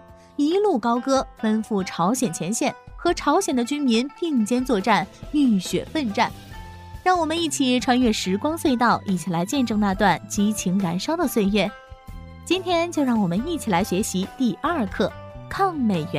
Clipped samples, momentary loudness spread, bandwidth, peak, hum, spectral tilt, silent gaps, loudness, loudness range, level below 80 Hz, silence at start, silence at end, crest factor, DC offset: under 0.1%; 7 LU; 15.5 kHz; -4 dBFS; none; -5 dB/octave; none; -22 LUFS; 2 LU; -46 dBFS; 0.1 s; 0 s; 18 dB; under 0.1%